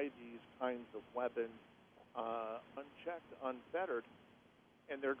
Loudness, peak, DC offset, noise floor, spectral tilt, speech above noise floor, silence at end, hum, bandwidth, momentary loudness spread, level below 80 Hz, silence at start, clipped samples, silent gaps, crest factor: -45 LUFS; -26 dBFS; under 0.1%; -68 dBFS; -6.5 dB/octave; 25 dB; 0 s; none; 5.6 kHz; 21 LU; -82 dBFS; 0 s; under 0.1%; none; 20 dB